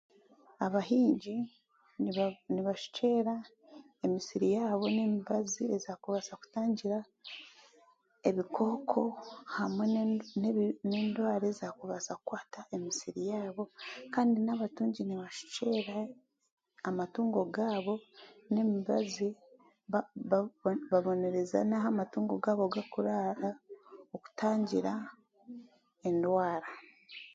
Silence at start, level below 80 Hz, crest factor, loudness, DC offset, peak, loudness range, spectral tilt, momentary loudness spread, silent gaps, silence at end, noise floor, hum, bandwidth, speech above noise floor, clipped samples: 0.6 s; -78 dBFS; 20 dB; -34 LUFS; under 0.1%; -14 dBFS; 3 LU; -5.5 dB/octave; 13 LU; 16.52-16.57 s; 0.05 s; -67 dBFS; none; 7.8 kHz; 34 dB; under 0.1%